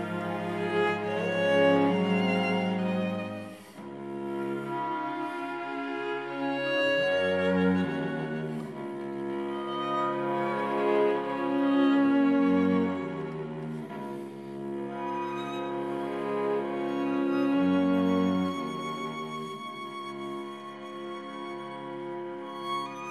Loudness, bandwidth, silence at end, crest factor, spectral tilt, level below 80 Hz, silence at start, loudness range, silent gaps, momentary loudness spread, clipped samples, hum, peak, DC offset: -29 LUFS; 12 kHz; 0 s; 16 dB; -7 dB/octave; -64 dBFS; 0 s; 9 LU; none; 14 LU; under 0.1%; none; -12 dBFS; under 0.1%